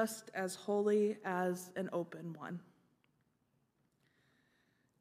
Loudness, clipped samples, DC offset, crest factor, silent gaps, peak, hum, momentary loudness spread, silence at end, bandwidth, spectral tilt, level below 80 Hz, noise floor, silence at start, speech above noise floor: -38 LUFS; under 0.1%; under 0.1%; 20 dB; none; -20 dBFS; none; 14 LU; 2.4 s; 15.5 kHz; -5.5 dB/octave; under -90 dBFS; -79 dBFS; 0 s; 41 dB